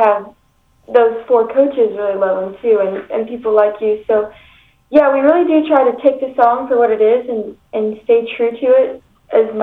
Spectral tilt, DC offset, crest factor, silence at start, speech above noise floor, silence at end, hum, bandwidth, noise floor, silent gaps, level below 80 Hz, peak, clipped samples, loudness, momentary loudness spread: -8 dB/octave; under 0.1%; 14 dB; 0 s; 41 dB; 0 s; none; 4.2 kHz; -55 dBFS; none; -56 dBFS; 0 dBFS; under 0.1%; -14 LUFS; 9 LU